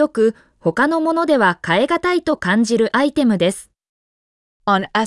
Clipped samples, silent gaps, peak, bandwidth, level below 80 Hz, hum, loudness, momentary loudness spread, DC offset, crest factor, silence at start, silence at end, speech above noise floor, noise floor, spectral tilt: under 0.1%; 3.89-4.60 s; -4 dBFS; 12 kHz; -54 dBFS; none; -17 LUFS; 5 LU; under 0.1%; 14 dB; 0 s; 0 s; over 74 dB; under -90 dBFS; -5 dB/octave